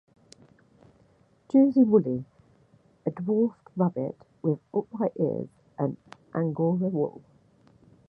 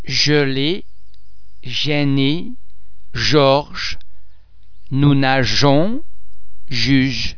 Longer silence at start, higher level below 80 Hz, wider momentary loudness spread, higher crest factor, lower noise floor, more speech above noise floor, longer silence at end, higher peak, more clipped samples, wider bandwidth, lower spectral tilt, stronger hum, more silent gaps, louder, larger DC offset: first, 1.55 s vs 0 s; second, -70 dBFS vs -38 dBFS; about the same, 14 LU vs 13 LU; about the same, 20 dB vs 18 dB; first, -62 dBFS vs -48 dBFS; first, 37 dB vs 33 dB; first, 0.9 s vs 0 s; second, -8 dBFS vs 0 dBFS; neither; first, 6 kHz vs 5.4 kHz; first, -11 dB/octave vs -5.5 dB/octave; neither; neither; second, -27 LUFS vs -16 LUFS; second, under 0.1% vs 8%